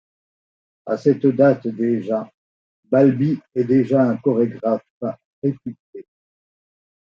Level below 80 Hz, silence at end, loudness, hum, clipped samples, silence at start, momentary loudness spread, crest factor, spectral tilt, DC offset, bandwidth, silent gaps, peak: -68 dBFS; 1.15 s; -19 LUFS; none; under 0.1%; 0.85 s; 14 LU; 18 dB; -10 dB/octave; under 0.1%; 6.8 kHz; 2.34-2.83 s, 4.90-5.01 s, 5.25-5.42 s, 5.79-5.93 s; -2 dBFS